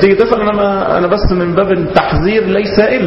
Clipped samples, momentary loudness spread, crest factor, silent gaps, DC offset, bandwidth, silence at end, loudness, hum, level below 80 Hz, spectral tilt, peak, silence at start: 0.3%; 2 LU; 10 dB; none; under 0.1%; 6 kHz; 0 s; -12 LUFS; none; -26 dBFS; -8.5 dB/octave; 0 dBFS; 0 s